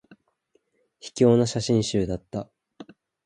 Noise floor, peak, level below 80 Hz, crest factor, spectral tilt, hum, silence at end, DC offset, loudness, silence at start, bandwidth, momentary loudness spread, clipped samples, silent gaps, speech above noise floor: -69 dBFS; -6 dBFS; -52 dBFS; 20 dB; -6 dB/octave; none; 0.4 s; under 0.1%; -23 LUFS; 1.05 s; 10.5 kHz; 21 LU; under 0.1%; none; 46 dB